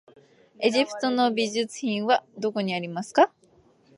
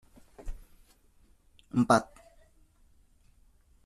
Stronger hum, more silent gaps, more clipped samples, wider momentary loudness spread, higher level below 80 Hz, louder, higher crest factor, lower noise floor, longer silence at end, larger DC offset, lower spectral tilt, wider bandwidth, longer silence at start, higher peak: neither; neither; neither; second, 6 LU vs 26 LU; second, -78 dBFS vs -52 dBFS; about the same, -25 LUFS vs -27 LUFS; second, 20 dB vs 26 dB; about the same, -59 dBFS vs -62 dBFS; second, 0.7 s vs 1.8 s; neither; second, -4.5 dB/octave vs -6 dB/octave; second, 11.5 kHz vs 14 kHz; first, 0.6 s vs 0.45 s; about the same, -6 dBFS vs -8 dBFS